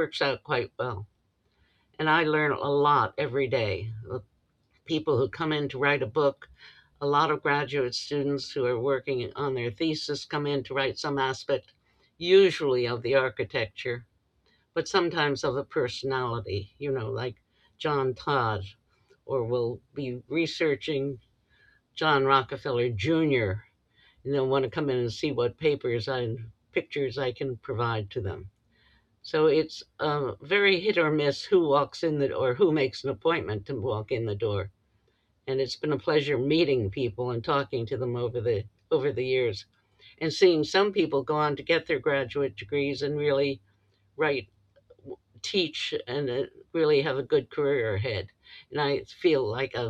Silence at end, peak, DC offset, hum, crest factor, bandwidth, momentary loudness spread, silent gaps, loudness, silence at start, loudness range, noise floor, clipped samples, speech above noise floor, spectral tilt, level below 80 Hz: 0 s; -8 dBFS; under 0.1%; none; 20 dB; 9.2 kHz; 11 LU; none; -27 LUFS; 0 s; 5 LU; -70 dBFS; under 0.1%; 43 dB; -6 dB/octave; -62 dBFS